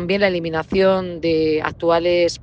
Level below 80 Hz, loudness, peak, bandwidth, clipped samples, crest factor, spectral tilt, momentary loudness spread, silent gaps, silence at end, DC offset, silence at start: -46 dBFS; -18 LUFS; -2 dBFS; 9.2 kHz; under 0.1%; 16 dB; -5.5 dB/octave; 4 LU; none; 0 s; under 0.1%; 0 s